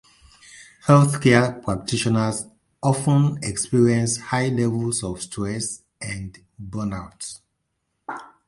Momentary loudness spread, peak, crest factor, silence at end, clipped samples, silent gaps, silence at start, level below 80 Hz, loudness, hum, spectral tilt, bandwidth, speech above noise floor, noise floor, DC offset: 19 LU; -2 dBFS; 20 dB; 0.25 s; under 0.1%; none; 0.55 s; -50 dBFS; -21 LUFS; none; -5.5 dB/octave; 11.5 kHz; 54 dB; -75 dBFS; under 0.1%